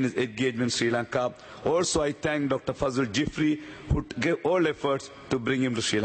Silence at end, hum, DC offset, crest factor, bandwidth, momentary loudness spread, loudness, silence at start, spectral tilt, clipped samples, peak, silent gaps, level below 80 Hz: 0 s; none; under 0.1%; 16 dB; 8.8 kHz; 6 LU; -27 LUFS; 0 s; -4.5 dB/octave; under 0.1%; -10 dBFS; none; -46 dBFS